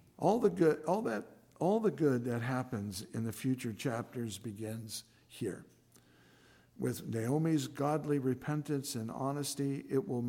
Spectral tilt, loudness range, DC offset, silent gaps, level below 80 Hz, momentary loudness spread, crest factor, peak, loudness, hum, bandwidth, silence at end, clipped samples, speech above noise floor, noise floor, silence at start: -6 dB/octave; 8 LU; under 0.1%; none; -72 dBFS; 12 LU; 20 dB; -16 dBFS; -35 LUFS; none; 17 kHz; 0 s; under 0.1%; 30 dB; -64 dBFS; 0.2 s